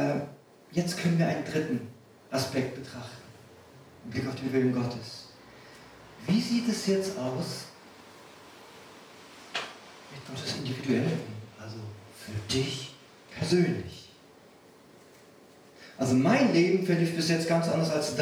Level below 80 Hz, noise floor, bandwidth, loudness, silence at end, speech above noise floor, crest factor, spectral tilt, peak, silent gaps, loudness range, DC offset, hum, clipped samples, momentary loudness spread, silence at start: -66 dBFS; -55 dBFS; 16 kHz; -29 LUFS; 0 s; 27 dB; 18 dB; -5.5 dB/octave; -12 dBFS; none; 7 LU; under 0.1%; none; under 0.1%; 24 LU; 0 s